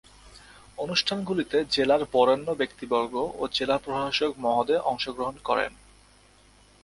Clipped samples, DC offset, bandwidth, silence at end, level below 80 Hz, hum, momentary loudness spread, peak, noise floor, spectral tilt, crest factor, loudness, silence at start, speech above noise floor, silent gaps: under 0.1%; under 0.1%; 11.5 kHz; 1.15 s; -56 dBFS; 50 Hz at -55 dBFS; 7 LU; -8 dBFS; -57 dBFS; -4 dB/octave; 20 dB; -26 LUFS; 0.25 s; 31 dB; none